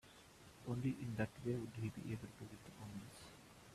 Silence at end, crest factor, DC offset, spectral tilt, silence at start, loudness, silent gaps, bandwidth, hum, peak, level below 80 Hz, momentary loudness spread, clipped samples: 0 s; 20 dB; under 0.1%; -7 dB/octave; 0.05 s; -47 LUFS; none; 14 kHz; none; -28 dBFS; -70 dBFS; 17 LU; under 0.1%